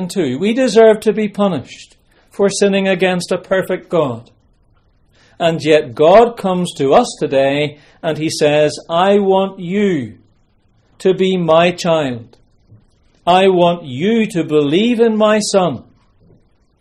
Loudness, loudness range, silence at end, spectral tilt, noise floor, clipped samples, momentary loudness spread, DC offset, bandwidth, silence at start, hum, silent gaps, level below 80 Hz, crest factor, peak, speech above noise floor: -14 LUFS; 4 LU; 1 s; -5.5 dB/octave; -55 dBFS; under 0.1%; 11 LU; under 0.1%; 14 kHz; 0 s; none; none; -52 dBFS; 14 dB; 0 dBFS; 42 dB